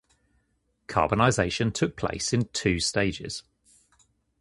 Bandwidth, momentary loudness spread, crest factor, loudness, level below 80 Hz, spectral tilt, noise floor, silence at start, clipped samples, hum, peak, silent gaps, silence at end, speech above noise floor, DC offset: 11.5 kHz; 9 LU; 22 dB; -26 LUFS; -48 dBFS; -4.5 dB/octave; -72 dBFS; 0.9 s; under 0.1%; none; -6 dBFS; none; 1 s; 47 dB; under 0.1%